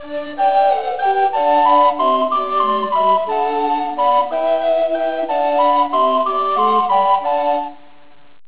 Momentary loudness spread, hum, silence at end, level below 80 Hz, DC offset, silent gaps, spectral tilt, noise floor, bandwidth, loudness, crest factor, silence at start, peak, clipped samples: 5 LU; none; 0.75 s; -60 dBFS; 1%; none; -7.5 dB/octave; -50 dBFS; 4 kHz; -16 LUFS; 14 dB; 0 s; -2 dBFS; under 0.1%